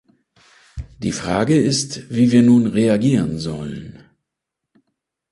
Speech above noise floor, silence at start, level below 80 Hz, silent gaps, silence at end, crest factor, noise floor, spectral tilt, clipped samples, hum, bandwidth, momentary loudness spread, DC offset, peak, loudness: 65 dB; 0.75 s; -44 dBFS; none; 1.4 s; 16 dB; -82 dBFS; -6 dB/octave; under 0.1%; none; 11.5 kHz; 20 LU; under 0.1%; -2 dBFS; -17 LUFS